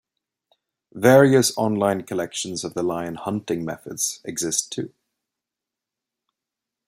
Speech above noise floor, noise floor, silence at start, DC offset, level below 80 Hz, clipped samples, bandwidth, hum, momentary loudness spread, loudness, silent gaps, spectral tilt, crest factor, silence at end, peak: 66 dB; -87 dBFS; 0.95 s; under 0.1%; -64 dBFS; under 0.1%; 16 kHz; none; 14 LU; -22 LUFS; none; -4.5 dB/octave; 22 dB; 2 s; -2 dBFS